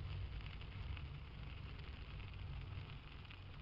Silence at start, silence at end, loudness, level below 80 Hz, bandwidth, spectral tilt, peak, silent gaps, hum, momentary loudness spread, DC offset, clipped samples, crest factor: 0 s; 0 s; -52 LUFS; -52 dBFS; 5.8 kHz; -5 dB/octave; -36 dBFS; none; none; 5 LU; under 0.1%; under 0.1%; 14 dB